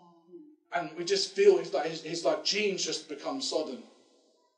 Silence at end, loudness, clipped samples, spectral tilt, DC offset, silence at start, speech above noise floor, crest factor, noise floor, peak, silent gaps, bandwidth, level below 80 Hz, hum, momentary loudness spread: 0.7 s; -29 LUFS; under 0.1%; -2.5 dB/octave; under 0.1%; 0.35 s; 37 dB; 22 dB; -67 dBFS; -10 dBFS; none; 10 kHz; under -90 dBFS; none; 13 LU